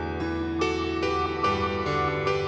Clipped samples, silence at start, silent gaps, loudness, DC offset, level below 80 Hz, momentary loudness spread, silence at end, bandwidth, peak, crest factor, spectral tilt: under 0.1%; 0 s; none; -26 LUFS; under 0.1%; -44 dBFS; 4 LU; 0 s; 8.6 kHz; -12 dBFS; 14 dB; -6 dB/octave